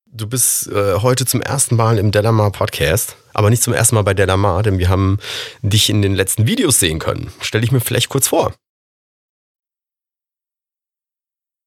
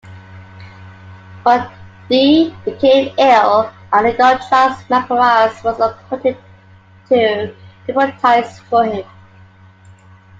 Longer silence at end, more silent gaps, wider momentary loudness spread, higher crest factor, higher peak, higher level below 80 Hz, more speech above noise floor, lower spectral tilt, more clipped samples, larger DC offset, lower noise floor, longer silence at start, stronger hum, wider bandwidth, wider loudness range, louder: first, 3.15 s vs 1.35 s; neither; about the same, 8 LU vs 9 LU; about the same, 16 dB vs 14 dB; about the same, 0 dBFS vs 0 dBFS; first, -40 dBFS vs -56 dBFS; first, 74 dB vs 31 dB; second, -4 dB/octave vs -5.5 dB/octave; neither; neither; first, -89 dBFS vs -44 dBFS; about the same, 0.15 s vs 0.05 s; neither; first, 16.5 kHz vs 7.8 kHz; about the same, 5 LU vs 5 LU; about the same, -15 LUFS vs -14 LUFS